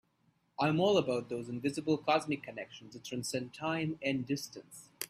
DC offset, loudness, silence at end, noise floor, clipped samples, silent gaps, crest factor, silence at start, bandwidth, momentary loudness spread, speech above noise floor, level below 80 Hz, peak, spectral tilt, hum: under 0.1%; -34 LUFS; 0.05 s; -74 dBFS; under 0.1%; none; 20 dB; 0.6 s; 15.5 kHz; 17 LU; 40 dB; -72 dBFS; -16 dBFS; -5 dB/octave; none